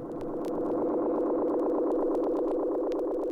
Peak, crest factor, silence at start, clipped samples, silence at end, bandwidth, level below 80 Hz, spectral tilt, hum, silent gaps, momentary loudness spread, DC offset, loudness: -20 dBFS; 10 dB; 0 s; under 0.1%; 0 s; 7.8 kHz; -54 dBFS; -8.5 dB/octave; none; none; 4 LU; under 0.1%; -29 LUFS